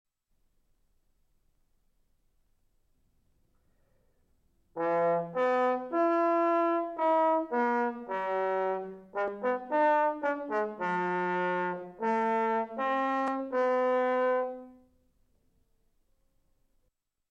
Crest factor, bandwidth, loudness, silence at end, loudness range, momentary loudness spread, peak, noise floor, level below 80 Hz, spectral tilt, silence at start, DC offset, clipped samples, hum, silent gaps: 14 dB; 7.6 kHz; -29 LUFS; 2.6 s; 6 LU; 8 LU; -18 dBFS; -77 dBFS; -72 dBFS; -7 dB/octave; 4.75 s; under 0.1%; under 0.1%; none; none